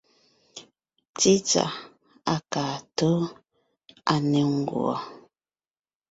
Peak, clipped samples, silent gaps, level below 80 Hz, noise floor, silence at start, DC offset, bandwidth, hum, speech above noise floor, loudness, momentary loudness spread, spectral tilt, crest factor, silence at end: -6 dBFS; under 0.1%; 1.09-1.14 s; -64 dBFS; under -90 dBFS; 0.55 s; under 0.1%; 8 kHz; none; over 66 dB; -25 LUFS; 21 LU; -4.5 dB/octave; 22 dB; 0.95 s